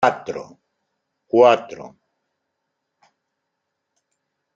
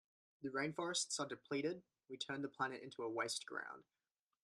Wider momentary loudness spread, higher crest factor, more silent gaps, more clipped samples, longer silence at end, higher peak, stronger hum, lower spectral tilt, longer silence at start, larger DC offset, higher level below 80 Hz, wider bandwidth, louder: first, 22 LU vs 12 LU; about the same, 22 dB vs 20 dB; neither; neither; first, 2.7 s vs 0.6 s; first, -2 dBFS vs -26 dBFS; neither; first, -5 dB/octave vs -2.5 dB/octave; second, 0 s vs 0.4 s; neither; first, -72 dBFS vs -88 dBFS; second, 7.6 kHz vs 13 kHz; first, -17 LUFS vs -44 LUFS